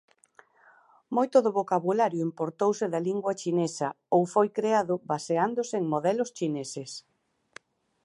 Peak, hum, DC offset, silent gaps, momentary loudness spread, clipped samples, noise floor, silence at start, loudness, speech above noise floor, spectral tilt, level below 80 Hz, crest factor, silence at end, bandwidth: -8 dBFS; none; under 0.1%; none; 8 LU; under 0.1%; -60 dBFS; 1.1 s; -27 LUFS; 33 dB; -6 dB/octave; -80 dBFS; 20 dB; 1.05 s; 11.5 kHz